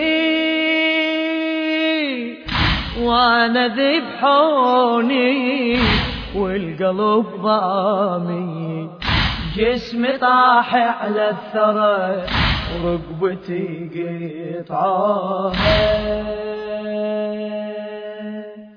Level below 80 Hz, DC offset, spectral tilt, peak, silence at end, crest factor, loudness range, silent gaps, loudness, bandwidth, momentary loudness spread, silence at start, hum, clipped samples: -34 dBFS; under 0.1%; -7 dB/octave; -2 dBFS; 0.05 s; 16 dB; 5 LU; none; -18 LUFS; 5.4 kHz; 12 LU; 0 s; none; under 0.1%